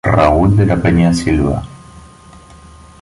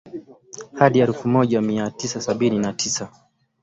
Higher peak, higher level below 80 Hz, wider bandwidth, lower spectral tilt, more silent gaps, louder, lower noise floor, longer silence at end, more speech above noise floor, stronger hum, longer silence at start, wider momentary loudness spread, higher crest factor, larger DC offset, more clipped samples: about the same, 0 dBFS vs -2 dBFS; first, -26 dBFS vs -58 dBFS; first, 11.5 kHz vs 8.2 kHz; first, -7.5 dB/octave vs -5 dB/octave; neither; first, -13 LUFS vs -20 LUFS; about the same, -39 dBFS vs -41 dBFS; first, 1.05 s vs 0.55 s; first, 27 dB vs 21 dB; neither; about the same, 0.05 s vs 0.05 s; second, 9 LU vs 21 LU; second, 14 dB vs 20 dB; neither; neither